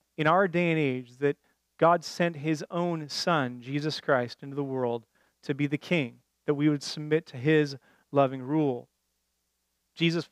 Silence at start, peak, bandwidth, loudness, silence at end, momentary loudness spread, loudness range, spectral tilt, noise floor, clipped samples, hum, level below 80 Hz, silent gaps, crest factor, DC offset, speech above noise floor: 0.2 s; -8 dBFS; 13.5 kHz; -28 LUFS; 0.05 s; 11 LU; 3 LU; -6 dB/octave; -78 dBFS; under 0.1%; none; -80 dBFS; none; 20 dB; under 0.1%; 50 dB